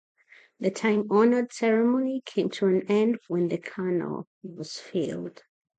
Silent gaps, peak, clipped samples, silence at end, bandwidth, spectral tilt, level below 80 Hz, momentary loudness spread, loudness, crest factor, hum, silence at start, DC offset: 4.27-4.41 s; -10 dBFS; under 0.1%; 0.5 s; 9.2 kHz; -6.5 dB/octave; -76 dBFS; 15 LU; -26 LUFS; 16 dB; none; 0.6 s; under 0.1%